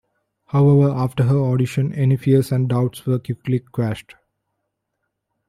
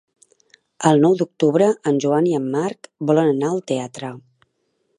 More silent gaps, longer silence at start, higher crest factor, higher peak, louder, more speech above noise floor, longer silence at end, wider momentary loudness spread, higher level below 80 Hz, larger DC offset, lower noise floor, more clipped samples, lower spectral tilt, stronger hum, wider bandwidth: neither; second, 0.55 s vs 0.8 s; about the same, 14 dB vs 18 dB; about the same, -4 dBFS vs -2 dBFS; about the same, -19 LUFS vs -19 LUFS; first, 59 dB vs 51 dB; first, 1.45 s vs 0.8 s; second, 9 LU vs 12 LU; first, -54 dBFS vs -70 dBFS; neither; first, -76 dBFS vs -69 dBFS; neither; first, -8.5 dB/octave vs -6.5 dB/octave; neither; first, 13 kHz vs 11 kHz